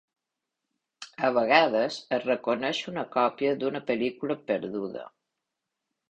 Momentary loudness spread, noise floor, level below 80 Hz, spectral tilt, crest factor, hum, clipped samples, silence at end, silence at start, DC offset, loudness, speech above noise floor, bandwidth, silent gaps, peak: 13 LU; -86 dBFS; -72 dBFS; -5 dB/octave; 24 dB; none; under 0.1%; 1.05 s; 1 s; under 0.1%; -27 LUFS; 59 dB; 9.2 kHz; none; -6 dBFS